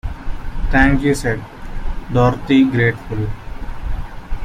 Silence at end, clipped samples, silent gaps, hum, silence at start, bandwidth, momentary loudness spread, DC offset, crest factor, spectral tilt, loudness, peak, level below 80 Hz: 0 s; under 0.1%; none; none; 0.05 s; 13.5 kHz; 18 LU; under 0.1%; 16 dB; -7 dB/octave; -17 LUFS; -2 dBFS; -24 dBFS